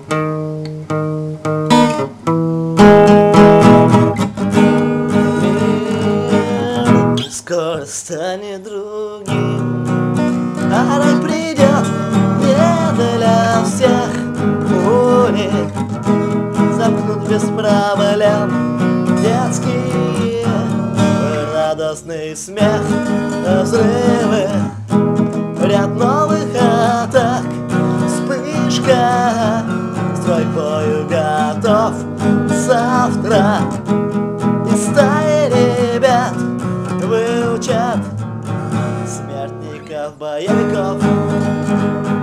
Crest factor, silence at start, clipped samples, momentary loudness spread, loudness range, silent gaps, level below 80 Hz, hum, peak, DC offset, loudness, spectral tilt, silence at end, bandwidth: 14 dB; 0 s; under 0.1%; 9 LU; 8 LU; none; -46 dBFS; none; 0 dBFS; under 0.1%; -14 LUFS; -6.5 dB/octave; 0 s; 14 kHz